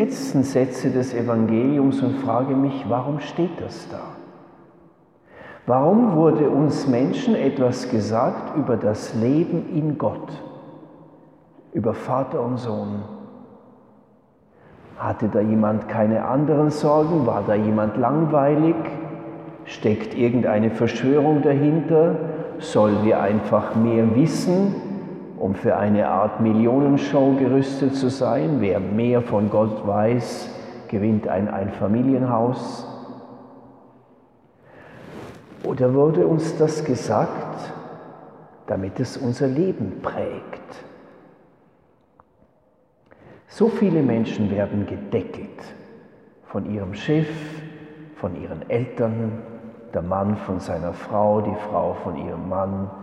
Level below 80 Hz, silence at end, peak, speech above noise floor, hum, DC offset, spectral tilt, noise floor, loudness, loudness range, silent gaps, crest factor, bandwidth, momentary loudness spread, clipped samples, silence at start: -58 dBFS; 0 s; -4 dBFS; 40 dB; none; under 0.1%; -8 dB/octave; -60 dBFS; -21 LUFS; 9 LU; none; 18 dB; 11.5 kHz; 17 LU; under 0.1%; 0 s